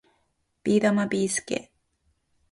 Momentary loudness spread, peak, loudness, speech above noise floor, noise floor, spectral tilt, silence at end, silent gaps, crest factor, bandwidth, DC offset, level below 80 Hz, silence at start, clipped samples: 11 LU; -10 dBFS; -25 LUFS; 49 dB; -72 dBFS; -4.5 dB/octave; 0.9 s; none; 18 dB; 11.5 kHz; under 0.1%; -64 dBFS; 0.65 s; under 0.1%